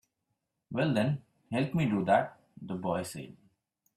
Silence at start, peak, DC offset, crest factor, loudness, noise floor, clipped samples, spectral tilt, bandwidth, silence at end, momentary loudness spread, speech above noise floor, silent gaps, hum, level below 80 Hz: 0.7 s; -12 dBFS; under 0.1%; 20 dB; -31 LUFS; -83 dBFS; under 0.1%; -7 dB/octave; 14 kHz; 0.65 s; 15 LU; 53 dB; none; none; -68 dBFS